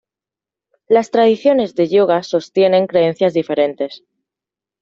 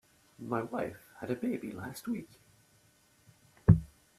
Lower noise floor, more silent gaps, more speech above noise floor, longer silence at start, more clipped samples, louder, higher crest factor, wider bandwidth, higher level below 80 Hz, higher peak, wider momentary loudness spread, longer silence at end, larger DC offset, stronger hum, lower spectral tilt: first, -88 dBFS vs -66 dBFS; neither; first, 74 dB vs 29 dB; first, 0.9 s vs 0.4 s; neither; first, -15 LUFS vs -33 LUFS; second, 14 dB vs 28 dB; second, 7.6 kHz vs 13.5 kHz; second, -64 dBFS vs -52 dBFS; first, -2 dBFS vs -6 dBFS; second, 6 LU vs 15 LU; first, 0.85 s vs 0.3 s; neither; neither; second, -6.5 dB/octave vs -8.5 dB/octave